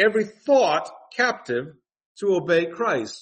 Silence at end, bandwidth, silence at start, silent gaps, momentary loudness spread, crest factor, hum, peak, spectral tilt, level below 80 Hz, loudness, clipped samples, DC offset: 0 s; 8.8 kHz; 0 s; 2.06-2.15 s; 10 LU; 16 dB; none; -6 dBFS; -4.5 dB/octave; -72 dBFS; -23 LUFS; under 0.1%; under 0.1%